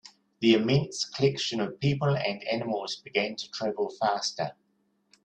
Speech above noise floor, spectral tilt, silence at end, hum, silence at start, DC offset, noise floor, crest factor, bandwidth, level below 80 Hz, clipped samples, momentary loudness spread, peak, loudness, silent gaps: 44 dB; -5 dB/octave; 0.75 s; none; 0.05 s; under 0.1%; -72 dBFS; 20 dB; 9.4 kHz; -62 dBFS; under 0.1%; 9 LU; -10 dBFS; -28 LUFS; none